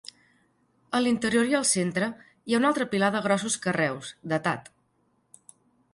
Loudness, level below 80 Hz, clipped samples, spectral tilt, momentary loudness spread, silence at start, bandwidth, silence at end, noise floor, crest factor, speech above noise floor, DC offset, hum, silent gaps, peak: -26 LUFS; -66 dBFS; under 0.1%; -4 dB/octave; 9 LU; 0.9 s; 11.5 kHz; 1.35 s; -70 dBFS; 18 dB; 44 dB; under 0.1%; none; none; -10 dBFS